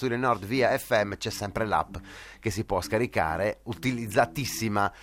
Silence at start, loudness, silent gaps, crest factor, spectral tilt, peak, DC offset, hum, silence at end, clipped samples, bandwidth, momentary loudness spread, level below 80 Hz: 0 s; -28 LUFS; none; 20 dB; -5 dB/octave; -8 dBFS; under 0.1%; none; 0 s; under 0.1%; 16.5 kHz; 7 LU; -50 dBFS